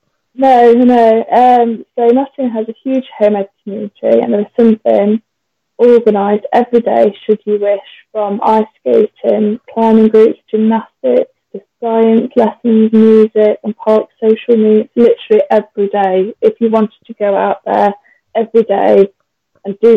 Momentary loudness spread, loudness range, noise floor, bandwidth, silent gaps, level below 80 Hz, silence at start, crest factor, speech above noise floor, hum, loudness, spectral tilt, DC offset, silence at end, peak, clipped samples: 10 LU; 3 LU; -71 dBFS; 5.4 kHz; none; -58 dBFS; 0.4 s; 10 dB; 61 dB; none; -11 LUFS; -8.5 dB/octave; under 0.1%; 0 s; 0 dBFS; under 0.1%